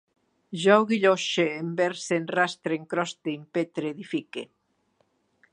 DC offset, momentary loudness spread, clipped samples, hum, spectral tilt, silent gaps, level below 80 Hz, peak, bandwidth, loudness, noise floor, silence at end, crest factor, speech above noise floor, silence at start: under 0.1%; 13 LU; under 0.1%; none; -4.5 dB/octave; none; -80 dBFS; -4 dBFS; 11 kHz; -26 LUFS; -70 dBFS; 1.1 s; 24 dB; 45 dB; 0.5 s